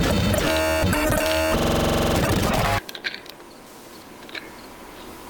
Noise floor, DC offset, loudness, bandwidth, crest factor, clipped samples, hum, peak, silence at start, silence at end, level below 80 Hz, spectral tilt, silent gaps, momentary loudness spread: -43 dBFS; under 0.1%; -21 LUFS; 19.5 kHz; 18 dB; under 0.1%; none; -4 dBFS; 0 s; 0 s; -34 dBFS; -4.5 dB/octave; none; 21 LU